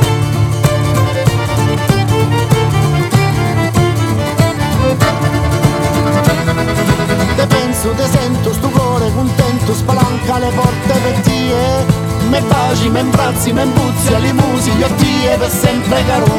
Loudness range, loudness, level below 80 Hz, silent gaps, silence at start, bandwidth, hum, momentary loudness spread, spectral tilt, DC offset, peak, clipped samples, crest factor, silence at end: 1 LU; -13 LUFS; -28 dBFS; none; 0 s; 17 kHz; none; 2 LU; -5.5 dB/octave; under 0.1%; 0 dBFS; under 0.1%; 10 dB; 0 s